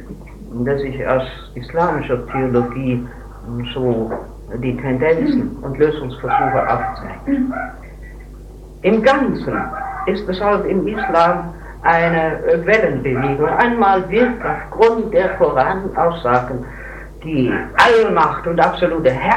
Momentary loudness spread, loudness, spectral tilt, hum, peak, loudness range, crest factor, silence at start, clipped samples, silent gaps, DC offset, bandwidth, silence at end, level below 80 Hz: 15 LU; -17 LUFS; -7 dB/octave; none; 0 dBFS; 5 LU; 16 dB; 0 s; under 0.1%; none; under 0.1%; 12 kHz; 0 s; -36 dBFS